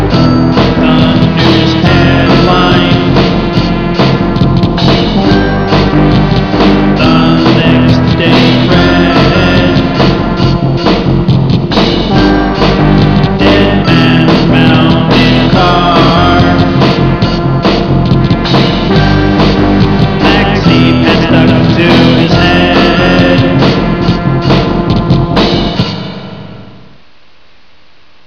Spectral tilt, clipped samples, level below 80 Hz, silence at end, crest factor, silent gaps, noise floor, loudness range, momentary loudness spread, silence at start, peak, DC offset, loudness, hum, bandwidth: -7.5 dB/octave; 2%; -20 dBFS; 1.55 s; 8 dB; none; -45 dBFS; 2 LU; 4 LU; 0 s; 0 dBFS; 2%; -7 LUFS; none; 5.4 kHz